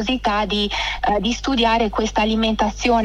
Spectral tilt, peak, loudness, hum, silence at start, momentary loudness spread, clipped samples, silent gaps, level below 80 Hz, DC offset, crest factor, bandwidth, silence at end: -4 dB/octave; -4 dBFS; -19 LUFS; 50 Hz at -35 dBFS; 0 s; 3 LU; under 0.1%; none; -34 dBFS; under 0.1%; 14 dB; 11.5 kHz; 0 s